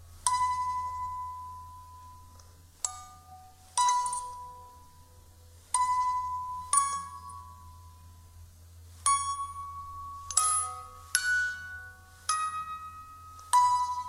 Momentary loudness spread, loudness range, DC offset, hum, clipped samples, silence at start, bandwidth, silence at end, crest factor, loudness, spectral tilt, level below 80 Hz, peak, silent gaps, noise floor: 22 LU; 5 LU; under 0.1%; none; under 0.1%; 0 s; 16 kHz; 0 s; 28 dB; -30 LUFS; 1 dB/octave; -58 dBFS; -6 dBFS; none; -55 dBFS